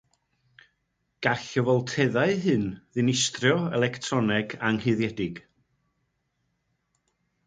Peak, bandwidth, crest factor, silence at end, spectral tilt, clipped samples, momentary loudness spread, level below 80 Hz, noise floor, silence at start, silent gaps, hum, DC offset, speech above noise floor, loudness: -6 dBFS; 9.6 kHz; 22 dB; 2.05 s; -5 dB/octave; under 0.1%; 6 LU; -60 dBFS; -76 dBFS; 1.2 s; none; none; under 0.1%; 51 dB; -26 LUFS